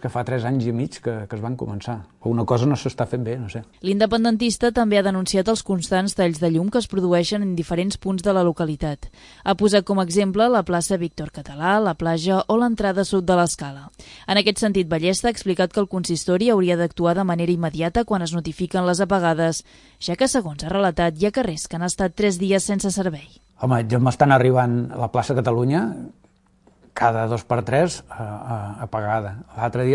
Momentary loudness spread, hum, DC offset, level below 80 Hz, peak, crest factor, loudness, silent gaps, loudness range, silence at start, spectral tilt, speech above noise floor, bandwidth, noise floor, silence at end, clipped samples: 11 LU; none; under 0.1%; -46 dBFS; -2 dBFS; 20 dB; -21 LUFS; none; 3 LU; 0 s; -5.5 dB/octave; 36 dB; 11.5 kHz; -57 dBFS; 0 s; under 0.1%